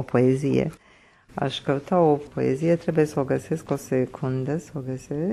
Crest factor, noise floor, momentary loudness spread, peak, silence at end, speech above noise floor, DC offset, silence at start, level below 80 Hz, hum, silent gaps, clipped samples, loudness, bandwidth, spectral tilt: 16 dB; -54 dBFS; 10 LU; -8 dBFS; 0 s; 30 dB; under 0.1%; 0 s; -56 dBFS; none; none; under 0.1%; -24 LUFS; 13 kHz; -7.5 dB/octave